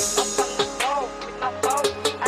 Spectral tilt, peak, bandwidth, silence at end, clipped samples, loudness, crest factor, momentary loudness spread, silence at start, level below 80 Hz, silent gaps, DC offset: -1.5 dB/octave; -10 dBFS; 15.5 kHz; 0 s; under 0.1%; -24 LUFS; 16 dB; 7 LU; 0 s; -52 dBFS; none; under 0.1%